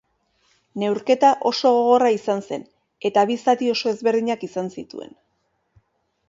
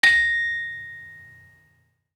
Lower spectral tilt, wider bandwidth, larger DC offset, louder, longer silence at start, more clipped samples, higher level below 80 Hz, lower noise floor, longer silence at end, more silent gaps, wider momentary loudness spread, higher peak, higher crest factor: first, -5 dB/octave vs 0 dB/octave; second, 7.8 kHz vs 14 kHz; neither; about the same, -20 LUFS vs -21 LUFS; first, 0.75 s vs 0.05 s; neither; second, -70 dBFS vs -58 dBFS; first, -70 dBFS vs -65 dBFS; first, 1.25 s vs 0.9 s; neither; second, 16 LU vs 25 LU; about the same, -4 dBFS vs -4 dBFS; about the same, 18 dB vs 20 dB